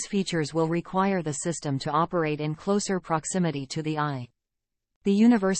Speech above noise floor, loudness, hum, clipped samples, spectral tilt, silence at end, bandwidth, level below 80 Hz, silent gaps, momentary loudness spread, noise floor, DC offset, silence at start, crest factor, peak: 58 dB; -26 LUFS; none; under 0.1%; -5.5 dB/octave; 0 s; 8.8 kHz; -60 dBFS; 4.96-5.01 s; 8 LU; -84 dBFS; under 0.1%; 0 s; 16 dB; -10 dBFS